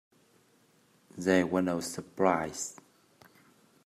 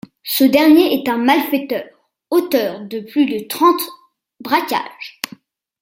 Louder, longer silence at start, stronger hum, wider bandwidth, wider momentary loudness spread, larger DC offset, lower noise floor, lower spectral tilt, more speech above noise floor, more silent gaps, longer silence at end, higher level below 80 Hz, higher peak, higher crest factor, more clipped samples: second, -30 LUFS vs -16 LUFS; first, 1.15 s vs 0.25 s; neither; second, 15 kHz vs 17 kHz; second, 12 LU vs 16 LU; neither; first, -66 dBFS vs -44 dBFS; first, -5 dB/octave vs -3.5 dB/octave; first, 36 dB vs 28 dB; neither; first, 1.15 s vs 0.7 s; second, -72 dBFS vs -62 dBFS; second, -12 dBFS vs 0 dBFS; first, 22 dB vs 16 dB; neither